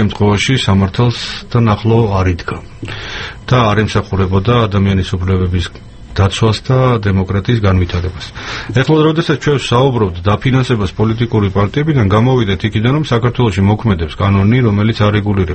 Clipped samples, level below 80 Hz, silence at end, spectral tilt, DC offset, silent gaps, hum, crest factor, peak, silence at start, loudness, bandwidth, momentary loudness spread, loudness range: under 0.1%; -32 dBFS; 0 s; -7 dB/octave; under 0.1%; none; none; 12 dB; 0 dBFS; 0 s; -13 LUFS; 8.6 kHz; 10 LU; 2 LU